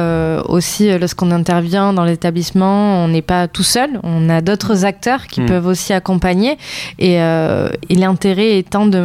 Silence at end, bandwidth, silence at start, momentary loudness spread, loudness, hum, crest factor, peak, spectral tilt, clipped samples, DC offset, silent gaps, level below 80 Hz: 0 s; 15.5 kHz; 0 s; 4 LU; -14 LUFS; none; 12 dB; -2 dBFS; -5.5 dB/octave; under 0.1%; under 0.1%; none; -38 dBFS